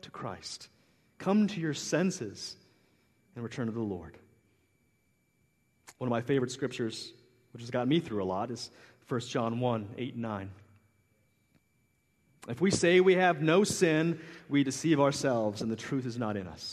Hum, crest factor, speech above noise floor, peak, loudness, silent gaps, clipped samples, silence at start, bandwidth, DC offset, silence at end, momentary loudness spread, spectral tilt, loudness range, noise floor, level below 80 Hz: none; 20 dB; 43 dB; -12 dBFS; -30 LUFS; none; under 0.1%; 0.05 s; 13 kHz; under 0.1%; 0 s; 17 LU; -5 dB/octave; 12 LU; -73 dBFS; -68 dBFS